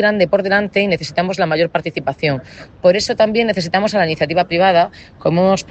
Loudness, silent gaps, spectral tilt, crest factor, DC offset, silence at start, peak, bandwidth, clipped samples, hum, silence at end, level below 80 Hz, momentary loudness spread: -16 LUFS; none; -5.5 dB/octave; 14 dB; under 0.1%; 0 s; -2 dBFS; 8.6 kHz; under 0.1%; none; 0.05 s; -50 dBFS; 6 LU